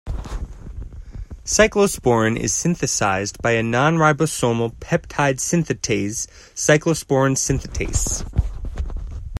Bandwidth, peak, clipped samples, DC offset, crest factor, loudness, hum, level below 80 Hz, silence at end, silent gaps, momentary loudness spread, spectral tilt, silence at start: 16 kHz; 0 dBFS; under 0.1%; under 0.1%; 20 dB; -19 LUFS; none; -32 dBFS; 0 s; none; 17 LU; -4.5 dB/octave; 0.05 s